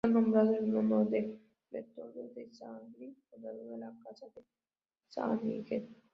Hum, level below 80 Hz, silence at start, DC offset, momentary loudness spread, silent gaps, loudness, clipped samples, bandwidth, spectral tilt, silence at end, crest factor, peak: none; -76 dBFS; 0.05 s; under 0.1%; 24 LU; none; -33 LUFS; under 0.1%; 5.8 kHz; -9 dB/octave; 0.2 s; 20 dB; -16 dBFS